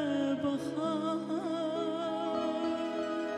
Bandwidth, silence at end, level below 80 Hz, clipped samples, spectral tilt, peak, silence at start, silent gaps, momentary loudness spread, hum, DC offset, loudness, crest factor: 11.5 kHz; 0 s; -74 dBFS; under 0.1%; -6 dB/octave; -20 dBFS; 0 s; none; 3 LU; none; under 0.1%; -33 LUFS; 12 dB